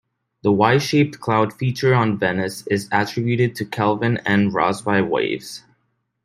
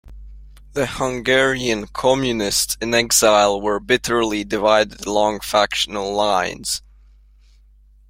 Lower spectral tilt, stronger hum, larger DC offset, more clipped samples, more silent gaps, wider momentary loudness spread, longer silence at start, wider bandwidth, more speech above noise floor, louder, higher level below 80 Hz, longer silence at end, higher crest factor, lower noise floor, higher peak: first, -6 dB/octave vs -2.5 dB/octave; neither; neither; neither; neither; about the same, 8 LU vs 8 LU; first, 0.45 s vs 0.05 s; about the same, 16 kHz vs 16.5 kHz; first, 51 dB vs 31 dB; about the same, -20 LUFS vs -18 LUFS; second, -60 dBFS vs -44 dBFS; second, 0.65 s vs 1.3 s; about the same, 18 dB vs 18 dB; first, -70 dBFS vs -50 dBFS; about the same, -2 dBFS vs -2 dBFS